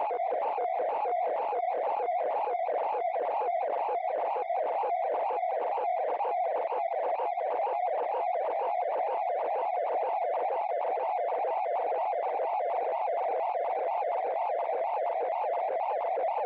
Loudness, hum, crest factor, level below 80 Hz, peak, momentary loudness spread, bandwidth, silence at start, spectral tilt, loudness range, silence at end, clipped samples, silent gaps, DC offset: -30 LUFS; none; 8 dB; under -90 dBFS; -22 dBFS; 1 LU; 4.8 kHz; 0 s; 0.5 dB/octave; 0 LU; 0 s; under 0.1%; none; under 0.1%